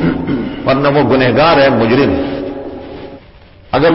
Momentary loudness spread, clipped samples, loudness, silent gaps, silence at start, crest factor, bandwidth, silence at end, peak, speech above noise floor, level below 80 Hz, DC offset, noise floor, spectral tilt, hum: 19 LU; under 0.1%; -12 LUFS; none; 0 s; 12 dB; 5.8 kHz; 0 s; 0 dBFS; 29 dB; -36 dBFS; under 0.1%; -39 dBFS; -10.5 dB/octave; none